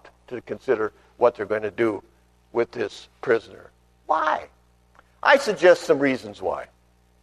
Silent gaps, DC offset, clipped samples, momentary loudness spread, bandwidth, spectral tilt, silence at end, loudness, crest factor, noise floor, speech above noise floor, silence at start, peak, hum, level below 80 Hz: none; under 0.1%; under 0.1%; 15 LU; 13 kHz; -4.5 dB/octave; 0.55 s; -23 LUFS; 20 dB; -60 dBFS; 37 dB; 0.3 s; -4 dBFS; 60 Hz at -60 dBFS; -60 dBFS